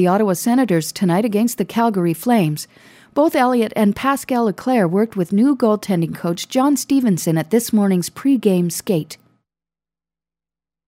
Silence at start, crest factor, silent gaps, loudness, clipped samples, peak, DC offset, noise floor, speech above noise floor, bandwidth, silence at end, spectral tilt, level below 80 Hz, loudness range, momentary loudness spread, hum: 0 s; 14 dB; none; -18 LUFS; under 0.1%; -4 dBFS; under 0.1%; under -90 dBFS; over 73 dB; 16 kHz; 1.75 s; -6 dB/octave; -60 dBFS; 2 LU; 5 LU; none